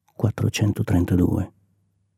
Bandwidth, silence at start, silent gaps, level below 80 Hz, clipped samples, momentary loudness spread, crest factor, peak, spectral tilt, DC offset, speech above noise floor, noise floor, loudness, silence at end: 15.5 kHz; 0.2 s; none; -42 dBFS; under 0.1%; 7 LU; 16 dB; -8 dBFS; -6.5 dB/octave; under 0.1%; 46 dB; -67 dBFS; -22 LUFS; 0.7 s